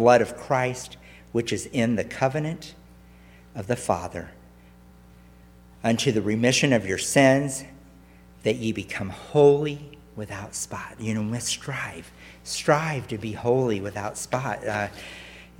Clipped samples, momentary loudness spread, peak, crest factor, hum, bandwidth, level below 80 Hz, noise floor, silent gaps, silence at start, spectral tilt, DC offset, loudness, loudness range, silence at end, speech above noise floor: under 0.1%; 20 LU; -4 dBFS; 22 dB; 60 Hz at -55 dBFS; 17 kHz; -54 dBFS; -51 dBFS; none; 0 s; -4.5 dB/octave; under 0.1%; -25 LUFS; 7 LU; 0.15 s; 26 dB